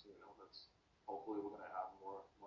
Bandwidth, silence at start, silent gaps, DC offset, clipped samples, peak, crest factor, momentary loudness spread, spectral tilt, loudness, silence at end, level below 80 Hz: 7.2 kHz; 0 s; none; under 0.1%; under 0.1%; -32 dBFS; 20 dB; 15 LU; -3 dB/octave; -51 LUFS; 0 s; -82 dBFS